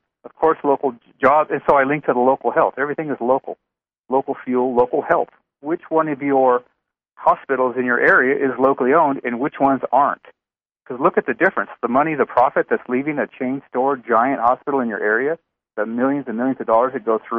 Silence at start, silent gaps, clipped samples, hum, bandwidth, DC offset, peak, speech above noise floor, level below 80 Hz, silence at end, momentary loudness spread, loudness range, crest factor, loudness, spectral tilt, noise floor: 0.25 s; 4.00-4.04 s; under 0.1%; none; 4.4 kHz; under 0.1%; -2 dBFS; 70 dB; -60 dBFS; 0 s; 8 LU; 3 LU; 16 dB; -19 LUFS; -9 dB/octave; -88 dBFS